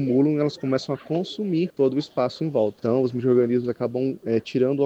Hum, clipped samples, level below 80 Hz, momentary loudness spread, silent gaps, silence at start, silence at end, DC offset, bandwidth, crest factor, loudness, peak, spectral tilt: none; under 0.1%; -66 dBFS; 6 LU; none; 0 s; 0 s; under 0.1%; 8.2 kHz; 14 dB; -24 LUFS; -8 dBFS; -8 dB/octave